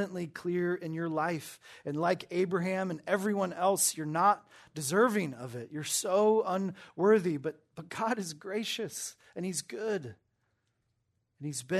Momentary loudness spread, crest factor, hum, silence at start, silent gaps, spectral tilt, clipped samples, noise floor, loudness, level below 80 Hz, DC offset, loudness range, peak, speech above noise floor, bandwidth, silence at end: 13 LU; 18 dB; none; 0 s; none; -4 dB/octave; under 0.1%; -78 dBFS; -31 LUFS; -78 dBFS; under 0.1%; 7 LU; -14 dBFS; 47 dB; 13.5 kHz; 0 s